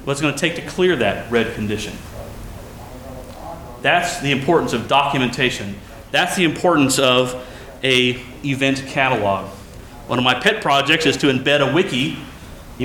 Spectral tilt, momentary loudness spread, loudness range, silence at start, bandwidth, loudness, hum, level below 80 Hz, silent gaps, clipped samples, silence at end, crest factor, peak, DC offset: -4 dB/octave; 20 LU; 6 LU; 0 s; 19.5 kHz; -18 LUFS; none; -42 dBFS; none; under 0.1%; 0 s; 18 dB; -2 dBFS; under 0.1%